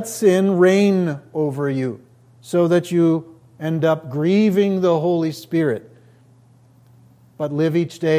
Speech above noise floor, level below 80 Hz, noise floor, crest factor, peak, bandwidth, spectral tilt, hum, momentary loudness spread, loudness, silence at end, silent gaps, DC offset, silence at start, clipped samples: 33 dB; -66 dBFS; -51 dBFS; 16 dB; -4 dBFS; 16 kHz; -7 dB/octave; none; 10 LU; -19 LUFS; 0 s; none; under 0.1%; 0 s; under 0.1%